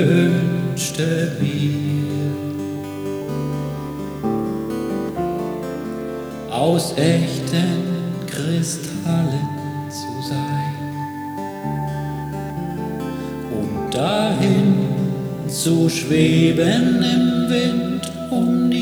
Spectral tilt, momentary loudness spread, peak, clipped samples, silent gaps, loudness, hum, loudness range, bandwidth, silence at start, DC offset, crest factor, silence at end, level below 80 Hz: -6 dB/octave; 11 LU; -4 dBFS; under 0.1%; none; -21 LUFS; none; 8 LU; over 20 kHz; 0 s; under 0.1%; 16 dB; 0 s; -48 dBFS